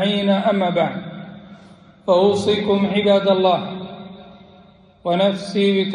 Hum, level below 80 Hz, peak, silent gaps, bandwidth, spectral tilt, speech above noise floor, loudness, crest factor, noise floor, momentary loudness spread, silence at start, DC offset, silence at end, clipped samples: none; -60 dBFS; -4 dBFS; none; 10.5 kHz; -6.5 dB/octave; 31 dB; -18 LUFS; 16 dB; -48 dBFS; 19 LU; 0 s; under 0.1%; 0 s; under 0.1%